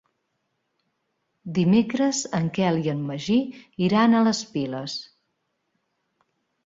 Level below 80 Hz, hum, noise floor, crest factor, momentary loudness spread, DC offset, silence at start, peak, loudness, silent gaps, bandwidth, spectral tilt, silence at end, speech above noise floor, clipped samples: -62 dBFS; none; -76 dBFS; 18 dB; 13 LU; under 0.1%; 1.45 s; -6 dBFS; -23 LUFS; none; 7.8 kHz; -5.5 dB/octave; 1.6 s; 53 dB; under 0.1%